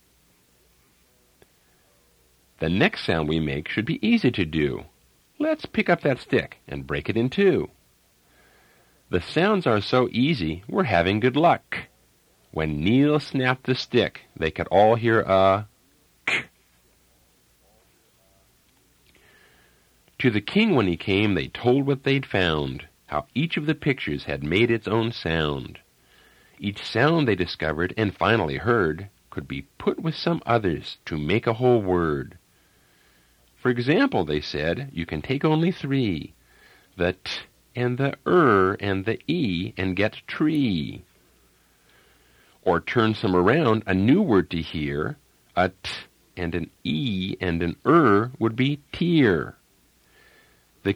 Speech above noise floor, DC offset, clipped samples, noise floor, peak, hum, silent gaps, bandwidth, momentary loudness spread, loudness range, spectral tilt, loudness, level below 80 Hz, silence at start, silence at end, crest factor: 39 dB; under 0.1%; under 0.1%; -61 dBFS; -4 dBFS; none; none; 15.5 kHz; 12 LU; 5 LU; -7 dB/octave; -23 LUFS; -50 dBFS; 2.6 s; 0 s; 20 dB